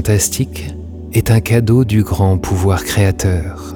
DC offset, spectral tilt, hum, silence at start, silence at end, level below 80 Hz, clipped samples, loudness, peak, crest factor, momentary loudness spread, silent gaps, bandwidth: under 0.1%; -5.5 dB/octave; none; 0 s; 0 s; -30 dBFS; under 0.1%; -14 LUFS; 0 dBFS; 14 dB; 9 LU; none; 19.5 kHz